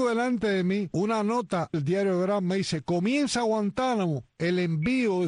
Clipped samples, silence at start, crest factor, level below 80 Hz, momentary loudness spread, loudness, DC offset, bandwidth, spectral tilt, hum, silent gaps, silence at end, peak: under 0.1%; 0 s; 12 dB; -60 dBFS; 3 LU; -27 LUFS; under 0.1%; 10.5 kHz; -6 dB/octave; none; none; 0 s; -14 dBFS